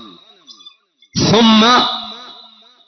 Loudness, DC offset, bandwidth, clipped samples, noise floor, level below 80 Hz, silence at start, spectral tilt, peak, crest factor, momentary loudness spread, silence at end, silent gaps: -12 LUFS; under 0.1%; 6.4 kHz; under 0.1%; -46 dBFS; -46 dBFS; 1.15 s; -4 dB/octave; -2 dBFS; 14 dB; 19 LU; 0.55 s; none